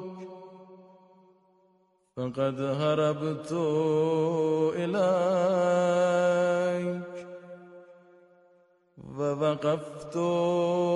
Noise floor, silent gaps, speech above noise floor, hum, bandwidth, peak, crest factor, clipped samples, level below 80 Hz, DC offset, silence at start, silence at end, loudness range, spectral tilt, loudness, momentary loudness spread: -68 dBFS; none; 41 dB; none; 11 kHz; -14 dBFS; 16 dB; under 0.1%; -72 dBFS; under 0.1%; 0 s; 0 s; 8 LU; -6.5 dB/octave; -27 LUFS; 19 LU